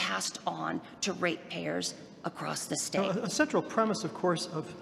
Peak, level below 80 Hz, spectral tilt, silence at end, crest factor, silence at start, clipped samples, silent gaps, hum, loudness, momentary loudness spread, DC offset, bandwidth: -12 dBFS; -72 dBFS; -3.5 dB/octave; 0 s; 20 dB; 0 s; under 0.1%; none; none; -32 LUFS; 8 LU; under 0.1%; 15.5 kHz